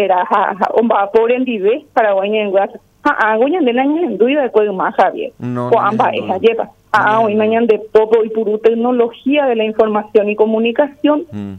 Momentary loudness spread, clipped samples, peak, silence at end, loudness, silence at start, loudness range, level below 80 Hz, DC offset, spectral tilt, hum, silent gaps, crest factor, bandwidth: 4 LU; under 0.1%; 0 dBFS; 0 s; -14 LUFS; 0 s; 1 LU; -58 dBFS; under 0.1%; -7 dB/octave; none; none; 14 dB; 6.4 kHz